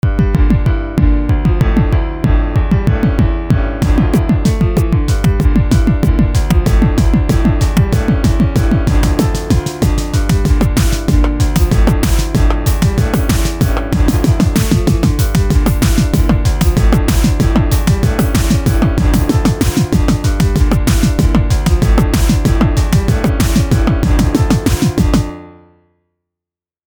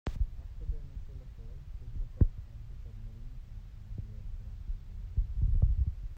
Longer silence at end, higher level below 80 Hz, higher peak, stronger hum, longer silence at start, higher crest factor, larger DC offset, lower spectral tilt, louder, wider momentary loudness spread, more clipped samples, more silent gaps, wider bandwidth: first, 1.35 s vs 0 s; first, -14 dBFS vs -36 dBFS; first, 0 dBFS vs -12 dBFS; neither; about the same, 0.05 s vs 0.05 s; second, 12 dB vs 22 dB; first, 0.2% vs under 0.1%; second, -6.5 dB/octave vs -9 dB/octave; first, -13 LUFS vs -38 LUFS; second, 2 LU vs 18 LU; neither; neither; first, over 20 kHz vs 4.7 kHz